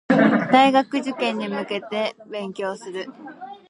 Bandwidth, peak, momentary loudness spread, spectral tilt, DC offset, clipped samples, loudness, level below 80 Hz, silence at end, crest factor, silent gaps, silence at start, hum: 10.5 kHz; -2 dBFS; 17 LU; -5.5 dB/octave; under 0.1%; under 0.1%; -21 LUFS; -70 dBFS; 0.15 s; 20 dB; none; 0.1 s; none